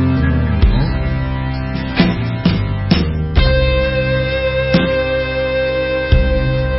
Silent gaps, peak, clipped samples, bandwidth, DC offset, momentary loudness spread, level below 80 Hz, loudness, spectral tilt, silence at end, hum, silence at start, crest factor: none; 0 dBFS; under 0.1%; 5.8 kHz; under 0.1%; 5 LU; -20 dBFS; -16 LUFS; -11 dB/octave; 0 s; none; 0 s; 14 dB